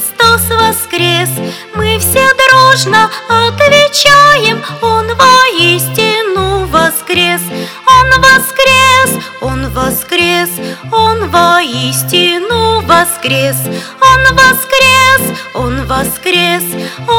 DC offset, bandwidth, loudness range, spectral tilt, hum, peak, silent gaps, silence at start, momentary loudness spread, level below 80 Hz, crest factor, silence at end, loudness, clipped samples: under 0.1%; over 20 kHz; 3 LU; -3 dB/octave; none; 0 dBFS; none; 0 s; 11 LU; -32 dBFS; 8 dB; 0 s; -8 LUFS; 2%